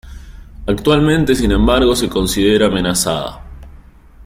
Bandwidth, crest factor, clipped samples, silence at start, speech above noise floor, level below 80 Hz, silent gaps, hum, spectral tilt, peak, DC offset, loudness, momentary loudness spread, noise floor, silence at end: 16.5 kHz; 14 dB; under 0.1%; 0.05 s; 27 dB; -26 dBFS; none; none; -4.5 dB/octave; -2 dBFS; under 0.1%; -14 LUFS; 9 LU; -40 dBFS; 0.05 s